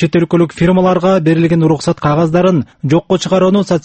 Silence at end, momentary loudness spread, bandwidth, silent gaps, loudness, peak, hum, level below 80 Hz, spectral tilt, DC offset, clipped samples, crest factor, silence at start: 0.05 s; 3 LU; 8.6 kHz; none; -12 LUFS; 0 dBFS; none; -42 dBFS; -7 dB/octave; under 0.1%; under 0.1%; 12 dB; 0 s